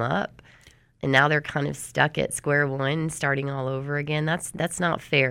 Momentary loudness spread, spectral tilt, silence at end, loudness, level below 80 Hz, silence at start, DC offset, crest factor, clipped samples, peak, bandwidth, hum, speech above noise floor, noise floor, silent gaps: 8 LU; -4.5 dB/octave; 0 s; -25 LUFS; -56 dBFS; 0 s; under 0.1%; 20 dB; under 0.1%; -4 dBFS; 16 kHz; none; 31 dB; -55 dBFS; none